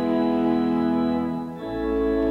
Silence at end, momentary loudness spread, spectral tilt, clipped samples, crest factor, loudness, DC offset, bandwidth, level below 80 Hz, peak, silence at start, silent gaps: 0 s; 7 LU; -8.5 dB/octave; under 0.1%; 12 dB; -24 LUFS; under 0.1%; 5.2 kHz; -42 dBFS; -10 dBFS; 0 s; none